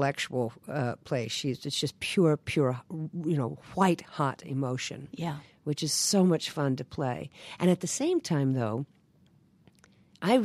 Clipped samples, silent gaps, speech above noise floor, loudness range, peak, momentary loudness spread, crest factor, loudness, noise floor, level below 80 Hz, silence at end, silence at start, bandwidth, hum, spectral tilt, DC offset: under 0.1%; none; 33 dB; 3 LU; -10 dBFS; 11 LU; 18 dB; -30 LUFS; -63 dBFS; -66 dBFS; 0 s; 0 s; 14.5 kHz; none; -5 dB/octave; under 0.1%